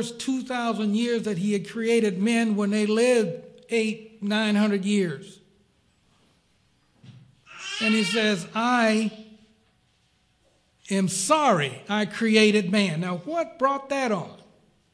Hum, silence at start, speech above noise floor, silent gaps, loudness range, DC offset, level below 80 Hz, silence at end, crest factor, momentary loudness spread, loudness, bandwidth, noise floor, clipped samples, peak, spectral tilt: none; 0 s; 42 dB; none; 6 LU; under 0.1%; -72 dBFS; 0.6 s; 18 dB; 9 LU; -24 LUFS; 11 kHz; -66 dBFS; under 0.1%; -6 dBFS; -4.5 dB/octave